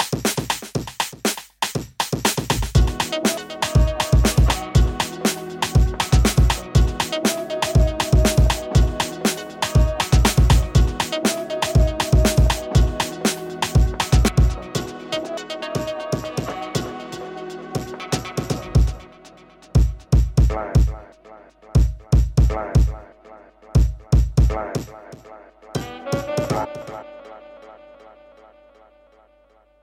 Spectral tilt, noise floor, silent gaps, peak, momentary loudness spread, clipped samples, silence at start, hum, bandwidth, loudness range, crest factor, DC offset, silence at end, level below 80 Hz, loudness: -5 dB/octave; -56 dBFS; none; -4 dBFS; 12 LU; under 0.1%; 0 s; none; 17 kHz; 9 LU; 16 dB; under 0.1%; 2.05 s; -24 dBFS; -21 LUFS